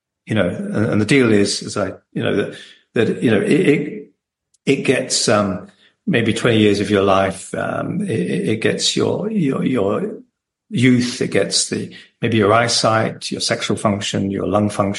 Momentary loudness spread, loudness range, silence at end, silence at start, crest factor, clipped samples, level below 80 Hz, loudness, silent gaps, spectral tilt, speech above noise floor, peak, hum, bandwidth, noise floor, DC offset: 10 LU; 2 LU; 0 s; 0.25 s; 16 dB; under 0.1%; -56 dBFS; -18 LUFS; none; -4.5 dB/octave; 49 dB; -2 dBFS; none; 11.5 kHz; -67 dBFS; under 0.1%